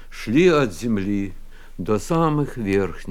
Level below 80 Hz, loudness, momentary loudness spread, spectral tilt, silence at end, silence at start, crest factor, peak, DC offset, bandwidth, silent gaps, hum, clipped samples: -36 dBFS; -21 LUFS; 10 LU; -6.5 dB/octave; 0 s; 0 s; 16 dB; -4 dBFS; under 0.1%; 15.5 kHz; none; none; under 0.1%